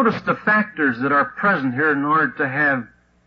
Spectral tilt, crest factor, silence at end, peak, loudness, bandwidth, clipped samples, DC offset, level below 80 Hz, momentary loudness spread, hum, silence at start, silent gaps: -8 dB/octave; 14 dB; 0.4 s; -6 dBFS; -19 LUFS; 6.6 kHz; under 0.1%; under 0.1%; -60 dBFS; 3 LU; none; 0 s; none